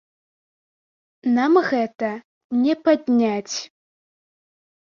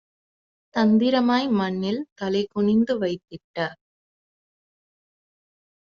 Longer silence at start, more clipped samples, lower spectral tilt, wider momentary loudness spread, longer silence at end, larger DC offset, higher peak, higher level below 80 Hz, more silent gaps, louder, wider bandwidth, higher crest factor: first, 1.25 s vs 0.75 s; neither; about the same, -4.5 dB/octave vs -5 dB/octave; about the same, 12 LU vs 12 LU; second, 1.25 s vs 2.1 s; neither; first, -4 dBFS vs -8 dBFS; about the same, -70 dBFS vs -66 dBFS; first, 2.25-2.50 s vs 2.12-2.16 s, 3.44-3.54 s; about the same, -21 LUFS vs -23 LUFS; about the same, 7.4 kHz vs 6.8 kHz; about the same, 20 dB vs 18 dB